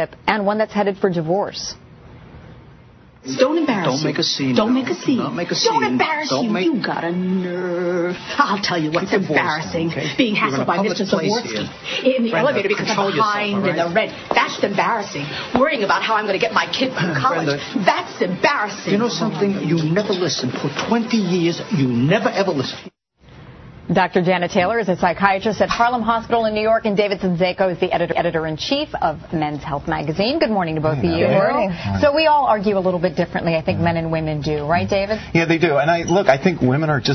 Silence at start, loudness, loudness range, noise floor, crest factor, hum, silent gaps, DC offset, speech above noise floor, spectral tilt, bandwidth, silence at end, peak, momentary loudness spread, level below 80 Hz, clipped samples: 0 s; -19 LUFS; 3 LU; -46 dBFS; 18 dB; none; none; under 0.1%; 27 dB; -5.5 dB/octave; 6.4 kHz; 0 s; 0 dBFS; 6 LU; -48 dBFS; under 0.1%